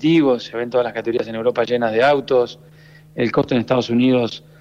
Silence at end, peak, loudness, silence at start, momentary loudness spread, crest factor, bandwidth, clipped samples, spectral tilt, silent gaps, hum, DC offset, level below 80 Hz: 0.2 s; -6 dBFS; -18 LUFS; 0 s; 7 LU; 12 dB; 7.8 kHz; under 0.1%; -7 dB/octave; none; none; under 0.1%; -56 dBFS